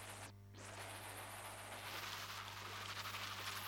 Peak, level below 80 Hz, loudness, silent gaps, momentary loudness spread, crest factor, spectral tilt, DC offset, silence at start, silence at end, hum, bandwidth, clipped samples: -34 dBFS; -72 dBFS; -48 LUFS; none; 8 LU; 16 dB; -2 dB/octave; under 0.1%; 0 s; 0 s; 50 Hz at -60 dBFS; over 20 kHz; under 0.1%